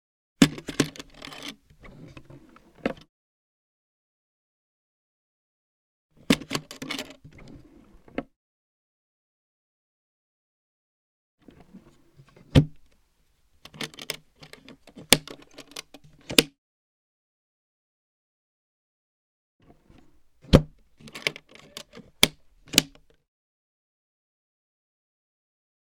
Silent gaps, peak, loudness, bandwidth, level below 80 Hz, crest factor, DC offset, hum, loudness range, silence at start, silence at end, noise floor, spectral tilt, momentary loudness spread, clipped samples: 3.09-6.09 s, 8.36-11.38 s, 16.58-19.59 s; 0 dBFS; -25 LUFS; 19 kHz; -46 dBFS; 32 dB; under 0.1%; none; 15 LU; 0.4 s; 3.1 s; -66 dBFS; -3.5 dB/octave; 26 LU; under 0.1%